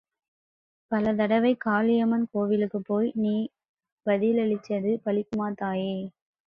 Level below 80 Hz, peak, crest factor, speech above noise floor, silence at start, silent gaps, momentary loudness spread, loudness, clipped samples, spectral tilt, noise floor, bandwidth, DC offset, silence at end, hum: -66 dBFS; -12 dBFS; 16 dB; over 65 dB; 0.9 s; 3.69-3.74 s, 3.92-3.97 s; 8 LU; -26 LUFS; under 0.1%; -8.5 dB/octave; under -90 dBFS; 5.8 kHz; under 0.1%; 0.35 s; none